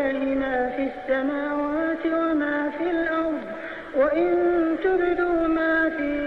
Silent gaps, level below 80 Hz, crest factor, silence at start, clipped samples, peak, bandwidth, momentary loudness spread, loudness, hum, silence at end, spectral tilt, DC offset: none; -50 dBFS; 12 dB; 0 s; under 0.1%; -10 dBFS; 5.2 kHz; 6 LU; -24 LUFS; none; 0 s; -7 dB/octave; under 0.1%